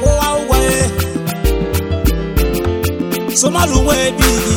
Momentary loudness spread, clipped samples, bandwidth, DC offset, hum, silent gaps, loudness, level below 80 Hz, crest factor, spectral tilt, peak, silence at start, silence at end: 6 LU; under 0.1%; 19 kHz; under 0.1%; none; none; -15 LUFS; -20 dBFS; 14 dB; -4.5 dB/octave; 0 dBFS; 0 s; 0 s